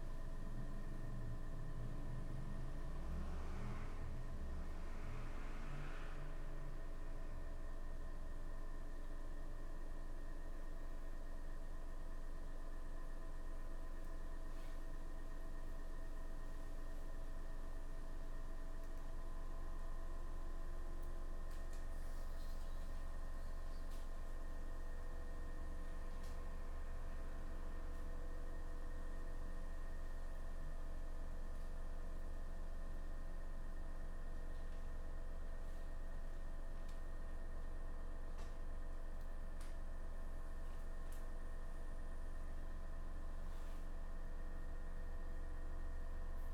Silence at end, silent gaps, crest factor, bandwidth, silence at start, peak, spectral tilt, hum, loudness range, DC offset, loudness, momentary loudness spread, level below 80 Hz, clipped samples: 0 s; none; 8 dB; 9.6 kHz; 0 s; -36 dBFS; -6 dB/octave; none; 4 LU; under 0.1%; -53 LUFS; 3 LU; -44 dBFS; under 0.1%